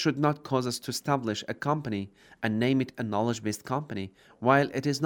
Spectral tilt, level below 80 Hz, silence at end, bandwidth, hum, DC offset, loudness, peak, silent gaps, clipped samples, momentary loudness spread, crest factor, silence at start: -5.5 dB/octave; -68 dBFS; 0 s; over 20 kHz; none; under 0.1%; -29 LUFS; -6 dBFS; none; under 0.1%; 11 LU; 22 dB; 0 s